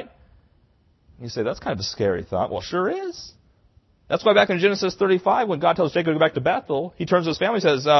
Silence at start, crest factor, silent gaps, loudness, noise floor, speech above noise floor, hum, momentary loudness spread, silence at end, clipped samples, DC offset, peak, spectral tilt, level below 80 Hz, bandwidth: 0 s; 20 dB; none; -22 LUFS; -60 dBFS; 39 dB; none; 9 LU; 0 s; under 0.1%; under 0.1%; -2 dBFS; -5.5 dB/octave; -54 dBFS; 6.2 kHz